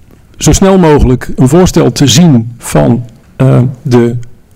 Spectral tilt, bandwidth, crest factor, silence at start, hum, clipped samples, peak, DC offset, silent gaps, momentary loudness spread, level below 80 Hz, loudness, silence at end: -6 dB/octave; 16.5 kHz; 8 dB; 0.4 s; none; 4%; 0 dBFS; under 0.1%; none; 7 LU; -22 dBFS; -7 LUFS; 0.2 s